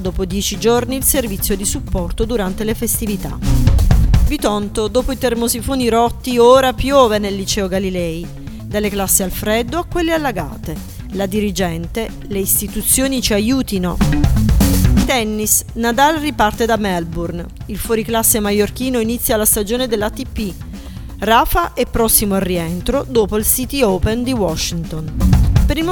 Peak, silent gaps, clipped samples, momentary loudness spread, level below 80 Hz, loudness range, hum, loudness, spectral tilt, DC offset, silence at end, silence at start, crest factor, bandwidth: 0 dBFS; none; under 0.1%; 11 LU; -22 dBFS; 4 LU; none; -16 LUFS; -4.5 dB/octave; under 0.1%; 0 s; 0 s; 16 dB; 19.5 kHz